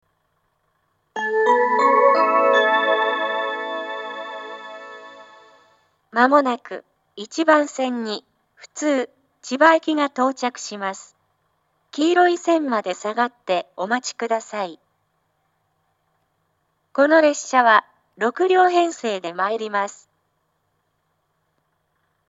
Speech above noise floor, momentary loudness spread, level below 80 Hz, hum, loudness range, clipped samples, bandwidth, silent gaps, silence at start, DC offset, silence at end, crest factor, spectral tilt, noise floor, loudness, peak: 51 dB; 17 LU; -84 dBFS; none; 8 LU; under 0.1%; 8 kHz; none; 1.15 s; under 0.1%; 2.35 s; 22 dB; -3 dB/octave; -70 dBFS; -19 LUFS; 0 dBFS